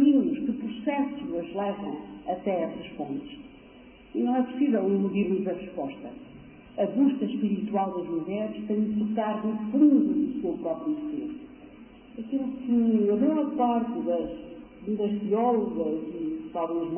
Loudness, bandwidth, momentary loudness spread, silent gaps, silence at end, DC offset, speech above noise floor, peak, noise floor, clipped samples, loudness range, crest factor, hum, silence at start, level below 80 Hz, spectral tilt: -28 LUFS; 3.4 kHz; 14 LU; none; 0 s; under 0.1%; 24 dB; -10 dBFS; -50 dBFS; under 0.1%; 5 LU; 16 dB; none; 0 s; -60 dBFS; -11.5 dB/octave